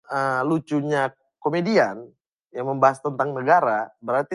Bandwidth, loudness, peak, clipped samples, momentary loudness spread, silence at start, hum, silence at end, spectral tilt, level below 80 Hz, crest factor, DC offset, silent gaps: 11.5 kHz; -22 LUFS; -4 dBFS; under 0.1%; 10 LU; 0.1 s; none; 0 s; -6.5 dB/octave; -72 dBFS; 18 dB; under 0.1%; 2.32-2.37 s